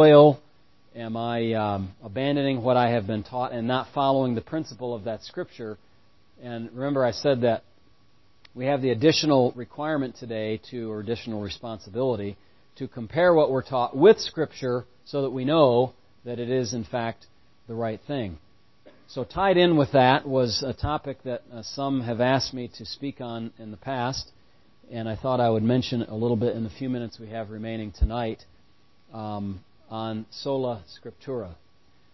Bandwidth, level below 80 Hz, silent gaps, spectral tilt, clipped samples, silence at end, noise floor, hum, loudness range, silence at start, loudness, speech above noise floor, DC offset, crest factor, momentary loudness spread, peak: 6.2 kHz; -44 dBFS; none; -6.5 dB/octave; under 0.1%; 0.6 s; -63 dBFS; none; 9 LU; 0 s; -25 LUFS; 38 dB; 0.2%; 22 dB; 17 LU; -2 dBFS